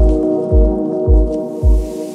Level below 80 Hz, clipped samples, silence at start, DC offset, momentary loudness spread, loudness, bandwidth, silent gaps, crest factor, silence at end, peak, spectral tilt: -14 dBFS; under 0.1%; 0 s; under 0.1%; 4 LU; -15 LUFS; 1.5 kHz; none; 12 dB; 0 s; -2 dBFS; -10 dB/octave